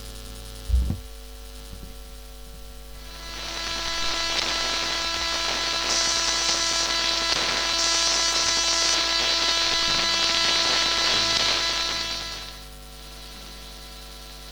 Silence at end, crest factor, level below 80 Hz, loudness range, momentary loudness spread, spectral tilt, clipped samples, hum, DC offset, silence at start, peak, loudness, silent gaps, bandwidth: 0 s; 20 dB; -38 dBFS; 12 LU; 22 LU; -0.5 dB/octave; under 0.1%; none; under 0.1%; 0 s; -4 dBFS; -21 LUFS; none; over 20 kHz